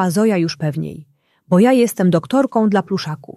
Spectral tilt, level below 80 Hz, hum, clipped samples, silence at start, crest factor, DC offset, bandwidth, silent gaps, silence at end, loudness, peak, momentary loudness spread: -6.5 dB/octave; -60 dBFS; none; under 0.1%; 0 s; 14 dB; under 0.1%; 14.5 kHz; none; 0.05 s; -16 LUFS; -2 dBFS; 10 LU